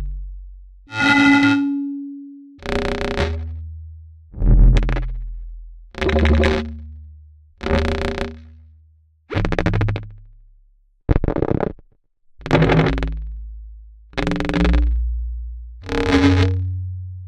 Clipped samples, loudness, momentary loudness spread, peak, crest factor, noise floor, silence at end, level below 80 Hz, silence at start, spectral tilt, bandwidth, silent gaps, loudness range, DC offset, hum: under 0.1%; -19 LUFS; 22 LU; 0 dBFS; 20 dB; -55 dBFS; 0 s; -24 dBFS; 0 s; -7 dB/octave; 9.4 kHz; none; 5 LU; under 0.1%; none